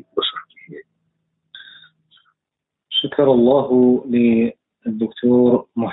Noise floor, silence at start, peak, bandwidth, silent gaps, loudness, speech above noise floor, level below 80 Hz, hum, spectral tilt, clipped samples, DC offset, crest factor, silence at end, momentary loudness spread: -83 dBFS; 0.15 s; -4 dBFS; 4.1 kHz; none; -17 LUFS; 68 dB; -58 dBFS; none; -11 dB/octave; under 0.1%; under 0.1%; 16 dB; 0 s; 10 LU